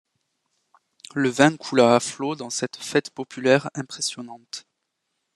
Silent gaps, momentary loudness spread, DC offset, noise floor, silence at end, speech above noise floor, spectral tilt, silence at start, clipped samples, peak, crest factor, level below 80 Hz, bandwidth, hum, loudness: none; 18 LU; under 0.1%; -78 dBFS; 0.75 s; 55 dB; -4 dB/octave; 1.15 s; under 0.1%; 0 dBFS; 24 dB; -70 dBFS; 12.5 kHz; none; -22 LUFS